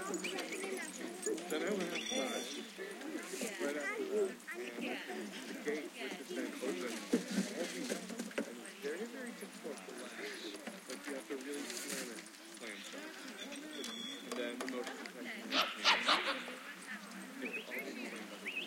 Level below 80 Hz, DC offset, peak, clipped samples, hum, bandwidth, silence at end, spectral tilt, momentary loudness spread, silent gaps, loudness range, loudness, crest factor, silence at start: -86 dBFS; under 0.1%; -16 dBFS; under 0.1%; none; 16.5 kHz; 0 s; -2.5 dB/octave; 10 LU; none; 8 LU; -40 LUFS; 26 dB; 0 s